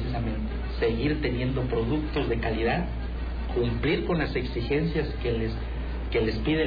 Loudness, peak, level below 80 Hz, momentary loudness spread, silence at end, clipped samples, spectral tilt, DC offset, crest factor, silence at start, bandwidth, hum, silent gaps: -28 LUFS; -16 dBFS; -32 dBFS; 7 LU; 0 s; under 0.1%; -9 dB/octave; under 0.1%; 10 dB; 0 s; 5 kHz; none; none